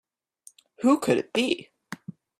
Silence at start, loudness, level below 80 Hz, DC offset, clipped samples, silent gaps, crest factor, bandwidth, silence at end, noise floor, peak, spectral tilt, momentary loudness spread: 0.8 s; -25 LUFS; -70 dBFS; under 0.1%; under 0.1%; none; 20 dB; 15 kHz; 0.45 s; -56 dBFS; -8 dBFS; -4.5 dB/octave; 19 LU